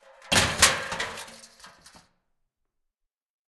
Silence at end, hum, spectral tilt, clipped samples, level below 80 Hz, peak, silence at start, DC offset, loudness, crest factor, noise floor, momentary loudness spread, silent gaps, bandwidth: 1.9 s; none; -1 dB/octave; under 0.1%; -52 dBFS; -2 dBFS; 0.25 s; under 0.1%; -22 LUFS; 28 dB; -83 dBFS; 20 LU; none; 12.5 kHz